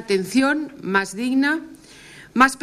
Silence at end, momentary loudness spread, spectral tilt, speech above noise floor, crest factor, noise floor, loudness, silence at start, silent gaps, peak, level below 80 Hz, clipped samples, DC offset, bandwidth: 0.05 s; 10 LU; -4 dB/octave; 24 dB; 20 dB; -44 dBFS; -21 LUFS; 0 s; none; -2 dBFS; -56 dBFS; under 0.1%; under 0.1%; 14 kHz